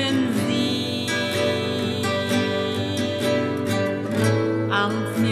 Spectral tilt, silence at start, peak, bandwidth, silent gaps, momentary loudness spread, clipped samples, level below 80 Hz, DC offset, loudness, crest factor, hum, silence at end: -5 dB/octave; 0 s; -8 dBFS; 14 kHz; none; 3 LU; under 0.1%; -62 dBFS; under 0.1%; -23 LUFS; 14 dB; none; 0 s